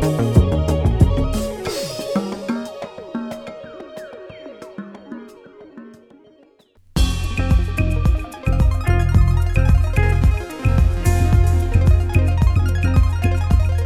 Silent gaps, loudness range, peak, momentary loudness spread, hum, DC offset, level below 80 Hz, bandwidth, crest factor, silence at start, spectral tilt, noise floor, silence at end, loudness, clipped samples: none; 17 LU; -2 dBFS; 19 LU; none; under 0.1%; -22 dBFS; 14 kHz; 16 dB; 0 s; -7 dB/octave; -52 dBFS; 0 s; -19 LUFS; under 0.1%